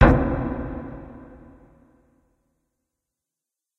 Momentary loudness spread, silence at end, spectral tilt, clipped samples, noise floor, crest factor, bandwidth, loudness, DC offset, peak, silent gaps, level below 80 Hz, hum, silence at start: 24 LU; 2.55 s; -9.5 dB/octave; under 0.1%; -87 dBFS; 24 dB; 6 kHz; -24 LUFS; under 0.1%; -2 dBFS; none; -32 dBFS; none; 0 s